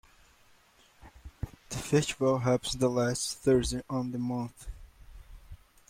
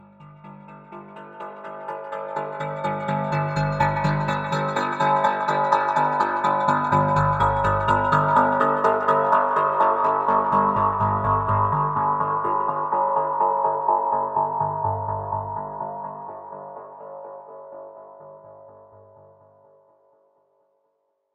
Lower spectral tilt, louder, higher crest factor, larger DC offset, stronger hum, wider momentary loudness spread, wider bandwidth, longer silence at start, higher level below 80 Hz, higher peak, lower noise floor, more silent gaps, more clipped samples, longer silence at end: second, -5 dB/octave vs -7 dB/octave; second, -30 LUFS vs -22 LUFS; about the same, 20 dB vs 18 dB; neither; second, none vs 50 Hz at -45 dBFS; about the same, 17 LU vs 19 LU; first, 16.5 kHz vs 9 kHz; first, 1.05 s vs 0.2 s; about the same, -50 dBFS vs -48 dBFS; second, -12 dBFS vs -4 dBFS; second, -62 dBFS vs -72 dBFS; neither; neither; second, 0.35 s vs 2.6 s